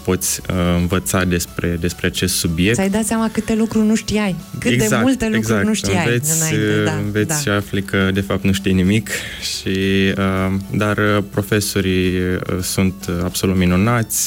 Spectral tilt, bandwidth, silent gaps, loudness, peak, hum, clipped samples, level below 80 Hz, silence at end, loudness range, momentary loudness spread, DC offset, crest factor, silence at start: -4.5 dB/octave; 17 kHz; none; -17 LUFS; -6 dBFS; none; under 0.1%; -38 dBFS; 0 s; 1 LU; 5 LU; under 0.1%; 12 dB; 0 s